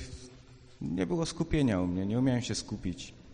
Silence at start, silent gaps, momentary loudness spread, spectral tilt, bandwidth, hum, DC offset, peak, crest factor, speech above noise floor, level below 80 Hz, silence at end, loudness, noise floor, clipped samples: 0 s; none; 16 LU; -6 dB/octave; 10 kHz; none; under 0.1%; -16 dBFS; 16 dB; 23 dB; -48 dBFS; 0 s; -32 LUFS; -54 dBFS; under 0.1%